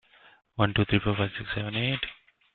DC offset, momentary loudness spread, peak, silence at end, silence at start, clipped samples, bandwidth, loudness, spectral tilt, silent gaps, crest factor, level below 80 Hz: under 0.1%; 8 LU; -8 dBFS; 0.4 s; 0.55 s; under 0.1%; 4.5 kHz; -28 LUFS; -10 dB/octave; none; 22 dB; -50 dBFS